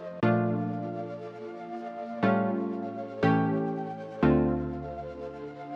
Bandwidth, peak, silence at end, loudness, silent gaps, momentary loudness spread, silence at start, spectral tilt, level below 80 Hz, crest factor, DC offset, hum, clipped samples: 6.6 kHz; -10 dBFS; 0 s; -30 LUFS; none; 14 LU; 0 s; -9.5 dB/octave; -50 dBFS; 18 dB; under 0.1%; none; under 0.1%